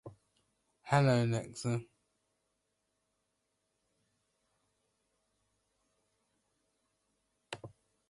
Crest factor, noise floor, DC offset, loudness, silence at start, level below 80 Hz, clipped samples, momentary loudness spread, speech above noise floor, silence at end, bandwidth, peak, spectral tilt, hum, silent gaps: 24 dB; -83 dBFS; under 0.1%; -32 LUFS; 0.05 s; -72 dBFS; under 0.1%; 20 LU; 52 dB; 0.45 s; 11.5 kHz; -16 dBFS; -6.5 dB/octave; none; none